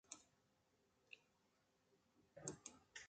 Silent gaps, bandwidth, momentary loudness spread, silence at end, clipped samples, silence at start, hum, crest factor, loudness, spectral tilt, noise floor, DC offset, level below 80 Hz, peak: none; 9 kHz; 11 LU; 0 s; under 0.1%; 0.05 s; none; 32 dB; -58 LUFS; -2.5 dB/octave; -82 dBFS; under 0.1%; -88 dBFS; -32 dBFS